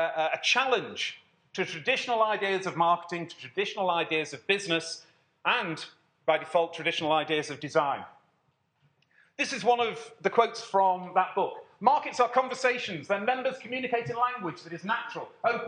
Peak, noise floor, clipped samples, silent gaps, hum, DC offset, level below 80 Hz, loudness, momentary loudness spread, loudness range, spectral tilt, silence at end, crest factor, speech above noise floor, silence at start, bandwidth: -6 dBFS; -72 dBFS; under 0.1%; none; none; under 0.1%; -84 dBFS; -28 LUFS; 10 LU; 3 LU; -3.5 dB/octave; 0 s; 22 dB; 44 dB; 0 s; 10 kHz